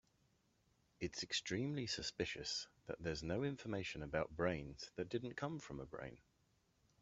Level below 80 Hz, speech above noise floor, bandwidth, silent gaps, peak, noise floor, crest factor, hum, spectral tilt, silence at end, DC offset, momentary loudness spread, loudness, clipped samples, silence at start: -66 dBFS; 34 dB; 8.2 kHz; none; -24 dBFS; -79 dBFS; 22 dB; none; -4.5 dB/octave; 0.85 s; under 0.1%; 10 LU; -44 LUFS; under 0.1%; 1 s